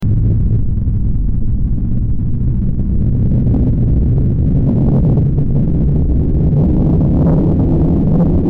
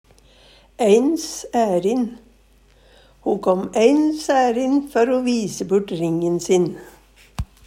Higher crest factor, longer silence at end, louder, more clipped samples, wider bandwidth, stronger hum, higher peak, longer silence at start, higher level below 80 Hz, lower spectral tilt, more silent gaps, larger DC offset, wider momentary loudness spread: second, 4 dB vs 18 dB; second, 0 s vs 0.25 s; first, -14 LUFS vs -19 LUFS; neither; second, 2.7 kHz vs 16 kHz; neither; second, -8 dBFS vs -2 dBFS; second, 0 s vs 0.8 s; first, -16 dBFS vs -46 dBFS; first, -13 dB/octave vs -5.5 dB/octave; neither; neither; second, 6 LU vs 10 LU